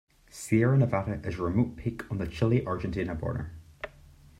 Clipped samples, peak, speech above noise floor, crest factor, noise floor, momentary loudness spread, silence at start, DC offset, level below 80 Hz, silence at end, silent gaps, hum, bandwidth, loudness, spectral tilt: under 0.1%; -12 dBFS; 26 dB; 18 dB; -54 dBFS; 19 LU; 0.35 s; under 0.1%; -50 dBFS; 0.5 s; none; none; 13 kHz; -29 LUFS; -7.5 dB/octave